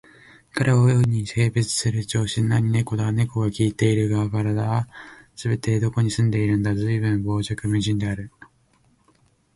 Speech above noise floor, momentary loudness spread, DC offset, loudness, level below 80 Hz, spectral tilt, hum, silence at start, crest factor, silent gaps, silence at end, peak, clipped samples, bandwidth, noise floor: 40 dB; 7 LU; under 0.1%; -22 LUFS; -48 dBFS; -6 dB/octave; none; 0.55 s; 16 dB; none; 1.25 s; -6 dBFS; under 0.1%; 11.5 kHz; -61 dBFS